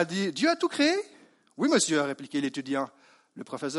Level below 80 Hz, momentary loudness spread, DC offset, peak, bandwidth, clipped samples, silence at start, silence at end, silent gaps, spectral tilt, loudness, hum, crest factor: -78 dBFS; 15 LU; under 0.1%; -10 dBFS; 11.5 kHz; under 0.1%; 0 s; 0 s; none; -3.5 dB/octave; -27 LUFS; none; 18 dB